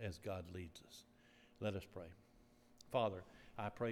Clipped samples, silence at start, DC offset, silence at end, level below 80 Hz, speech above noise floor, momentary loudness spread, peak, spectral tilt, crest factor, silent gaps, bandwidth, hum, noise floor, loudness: under 0.1%; 0 s; under 0.1%; 0 s; -72 dBFS; 24 dB; 20 LU; -24 dBFS; -6 dB/octave; 24 dB; none; 17.5 kHz; none; -69 dBFS; -46 LUFS